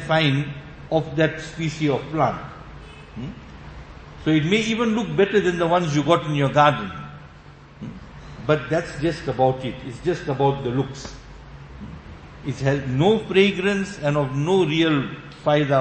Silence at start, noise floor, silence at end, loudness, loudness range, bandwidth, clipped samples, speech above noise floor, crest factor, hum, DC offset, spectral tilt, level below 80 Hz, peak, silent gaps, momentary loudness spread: 0 s; -45 dBFS; 0 s; -21 LUFS; 6 LU; 8.8 kHz; under 0.1%; 24 dB; 20 dB; none; under 0.1%; -6 dB/octave; -46 dBFS; -2 dBFS; none; 22 LU